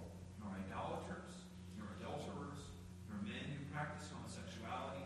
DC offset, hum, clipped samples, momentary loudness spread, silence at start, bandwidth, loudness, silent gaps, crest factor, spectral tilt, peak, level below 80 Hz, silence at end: under 0.1%; none; under 0.1%; 8 LU; 0 s; 13 kHz; -49 LUFS; none; 18 dB; -5.5 dB/octave; -30 dBFS; -62 dBFS; 0 s